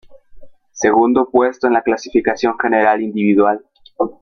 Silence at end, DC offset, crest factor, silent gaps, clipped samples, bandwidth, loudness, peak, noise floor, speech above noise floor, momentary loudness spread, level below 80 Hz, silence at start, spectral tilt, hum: 0.1 s; under 0.1%; 14 dB; none; under 0.1%; 6.8 kHz; -15 LUFS; -2 dBFS; -37 dBFS; 22 dB; 5 LU; -52 dBFS; 0.1 s; -5.5 dB/octave; none